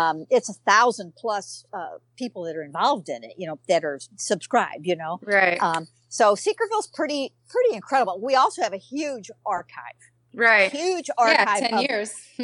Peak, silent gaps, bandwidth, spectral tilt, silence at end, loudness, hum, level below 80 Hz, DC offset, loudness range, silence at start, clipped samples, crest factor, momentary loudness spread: -4 dBFS; none; 11.5 kHz; -3 dB/octave; 0 s; -22 LUFS; none; -80 dBFS; under 0.1%; 5 LU; 0 s; under 0.1%; 18 dB; 17 LU